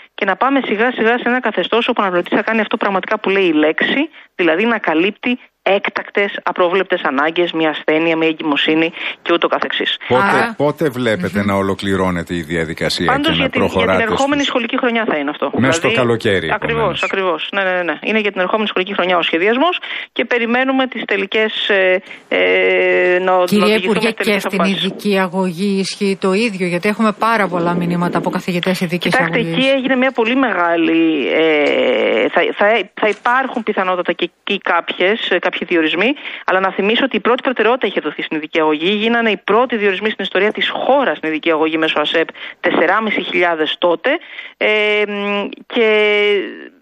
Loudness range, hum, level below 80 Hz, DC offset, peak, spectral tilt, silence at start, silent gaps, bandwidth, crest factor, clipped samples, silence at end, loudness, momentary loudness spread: 2 LU; none; -52 dBFS; under 0.1%; 0 dBFS; -5 dB/octave; 0.2 s; none; 15 kHz; 14 dB; under 0.1%; 0.15 s; -15 LUFS; 5 LU